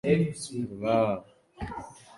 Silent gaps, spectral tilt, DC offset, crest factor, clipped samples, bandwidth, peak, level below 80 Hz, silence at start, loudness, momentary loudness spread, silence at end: none; -6.5 dB/octave; under 0.1%; 20 dB; under 0.1%; 11.5 kHz; -10 dBFS; -52 dBFS; 0.05 s; -29 LUFS; 15 LU; 0.05 s